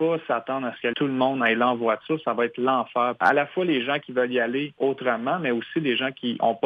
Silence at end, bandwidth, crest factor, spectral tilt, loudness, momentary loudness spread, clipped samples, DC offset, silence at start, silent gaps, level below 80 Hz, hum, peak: 0 s; 6.4 kHz; 16 dB; -7 dB/octave; -24 LUFS; 5 LU; under 0.1%; under 0.1%; 0 s; none; -74 dBFS; none; -8 dBFS